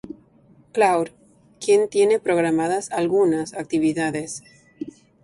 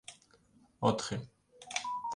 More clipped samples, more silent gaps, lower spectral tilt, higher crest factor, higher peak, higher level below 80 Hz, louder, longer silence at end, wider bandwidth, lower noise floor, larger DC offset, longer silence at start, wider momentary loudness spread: neither; neither; about the same, -5 dB/octave vs -4.5 dB/octave; second, 16 dB vs 24 dB; first, -6 dBFS vs -14 dBFS; about the same, -62 dBFS vs -66 dBFS; first, -21 LUFS vs -35 LUFS; first, 0.35 s vs 0 s; about the same, 11.5 kHz vs 11.5 kHz; second, -54 dBFS vs -66 dBFS; neither; about the same, 0.05 s vs 0.1 s; second, 18 LU vs 22 LU